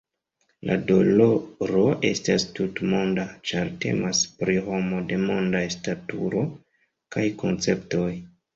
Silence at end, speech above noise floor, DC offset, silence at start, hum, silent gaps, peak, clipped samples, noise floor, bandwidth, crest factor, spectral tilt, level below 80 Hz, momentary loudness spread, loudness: 0.3 s; 48 dB; under 0.1%; 0.65 s; none; none; -6 dBFS; under 0.1%; -72 dBFS; 7.8 kHz; 20 dB; -5 dB/octave; -54 dBFS; 9 LU; -24 LUFS